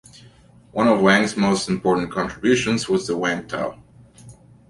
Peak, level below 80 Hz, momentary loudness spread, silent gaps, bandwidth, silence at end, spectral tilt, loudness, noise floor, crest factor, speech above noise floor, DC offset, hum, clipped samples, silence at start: -2 dBFS; -52 dBFS; 11 LU; none; 11.5 kHz; 0.35 s; -5 dB/octave; -20 LUFS; -49 dBFS; 18 dB; 30 dB; under 0.1%; none; under 0.1%; 0.75 s